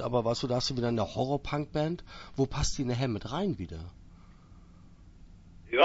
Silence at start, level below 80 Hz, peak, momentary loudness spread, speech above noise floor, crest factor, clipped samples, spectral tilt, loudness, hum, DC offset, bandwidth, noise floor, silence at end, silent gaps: 0 s; -46 dBFS; -8 dBFS; 11 LU; 22 dB; 24 dB; under 0.1%; -5.5 dB/octave; -32 LUFS; none; under 0.1%; 8 kHz; -53 dBFS; 0 s; none